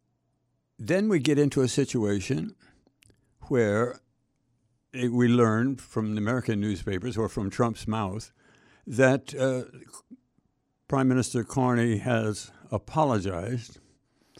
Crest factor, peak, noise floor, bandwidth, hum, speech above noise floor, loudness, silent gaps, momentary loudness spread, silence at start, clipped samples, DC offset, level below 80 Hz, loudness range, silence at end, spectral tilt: 22 dB; -6 dBFS; -74 dBFS; 12.5 kHz; none; 48 dB; -27 LUFS; none; 12 LU; 0.8 s; under 0.1%; under 0.1%; -56 dBFS; 3 LU; 0.7 s; -6.5 dB/octave